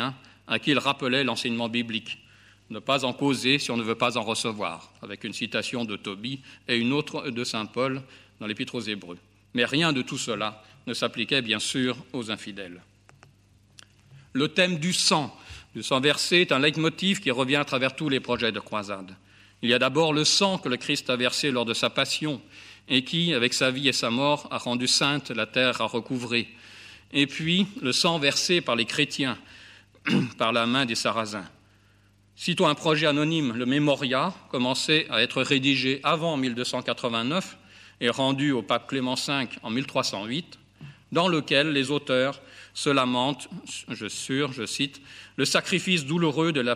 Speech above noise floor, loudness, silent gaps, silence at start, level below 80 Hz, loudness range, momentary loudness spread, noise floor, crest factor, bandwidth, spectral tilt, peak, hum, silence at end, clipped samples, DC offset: 34 dB; -25 LUFS; none; 0 s; -66 dBFS; 5 LU; 13 LU; -60 dBFS; 22 dB; 15.5 kHz; -3.5 dB/octave; -4 dBFS; none; 0 s; under 0.1%; under 0.1%